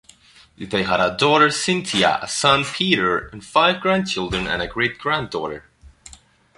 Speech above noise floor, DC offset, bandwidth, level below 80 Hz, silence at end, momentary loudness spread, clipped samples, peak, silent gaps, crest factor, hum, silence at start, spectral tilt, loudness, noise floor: 30 dB; under 0.1%; 11.5 kHz; -46 dBFS; 0.7 s; 9 LU; under 0.1%; -2 dBFS; none; 20 dB; none; 0.6 s; -3.5 dB/octave; -19 LUFS; -50 dBFS